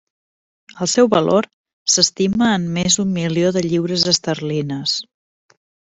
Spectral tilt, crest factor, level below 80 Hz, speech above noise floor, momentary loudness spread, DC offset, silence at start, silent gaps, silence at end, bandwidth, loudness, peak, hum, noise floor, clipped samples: -3.5 dB/octave; 18 dB; -54 dBFS; over 73 dB; 8 LU; under 0.1%; 0.75 s; 1.53-1.64 s, 1.73-1.86 s; 0.85 s; 8.4 kHz; -17 LUFS; 0 dBFS; none; under -90 dBFS; under 0.1%